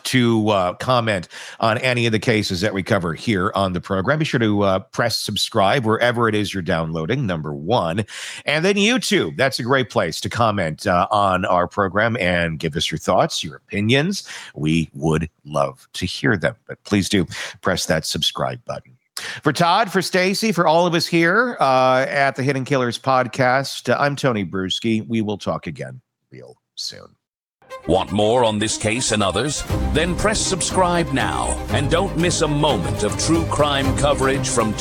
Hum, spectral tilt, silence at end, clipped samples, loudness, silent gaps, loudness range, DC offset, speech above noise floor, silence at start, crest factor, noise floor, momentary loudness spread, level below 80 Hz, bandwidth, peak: none; -4.5 dB/octave; 0 s; under 0.1%; -19 LUFS; 27.42-27.46 s; 5 LU; under 0.1%; 41 dB; 0.05 s; 16 dB; -60 dBFS; 9 LU; -38 dBFS; 17.5 kHz; -4 dBFS